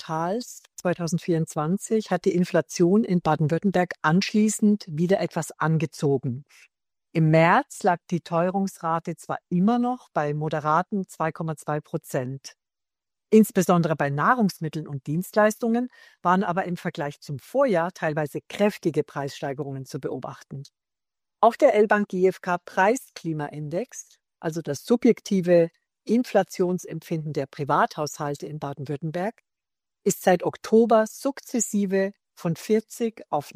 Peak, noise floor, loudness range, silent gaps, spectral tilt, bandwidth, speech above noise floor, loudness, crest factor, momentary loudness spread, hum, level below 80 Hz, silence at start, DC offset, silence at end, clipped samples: -4 dBFS; under -90 dBFS; 4 LU; none; -6 dB/octave; 16 kHz; over 66 dB; -24 LUFS; 20 dB; 12 LU; none; -68 dBFS; 0 s; under 0.1%; 0 s; under 0.1%